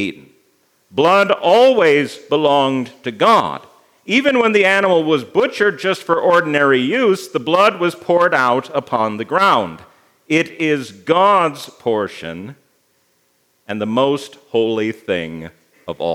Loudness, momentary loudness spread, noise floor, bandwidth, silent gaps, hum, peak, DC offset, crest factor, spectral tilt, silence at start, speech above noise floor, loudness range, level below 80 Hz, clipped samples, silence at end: -15 LUFS; 13 LU; -61 dBFS; 16 kHz; none; none; 0 dBFS; under 0.1%; 16 dB; -5 dB/octave; 0 s; 46 dB; 7 LU; -66 dBFS; under 0.1%; 0 s